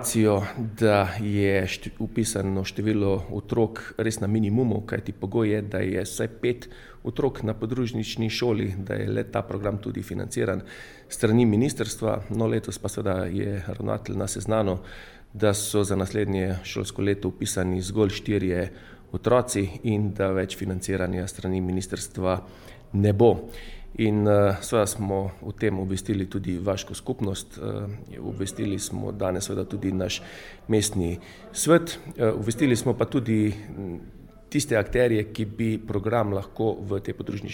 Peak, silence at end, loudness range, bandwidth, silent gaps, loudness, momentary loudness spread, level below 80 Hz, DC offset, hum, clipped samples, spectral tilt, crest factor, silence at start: -4 dBFS; 0 s; 4 LU; 19 kHz; none; -26 LUFS; 11 LU; -46 dBFS; under 0.1%; none; under 0.1%; -5.5 dB/octave; 20 dB; 0 s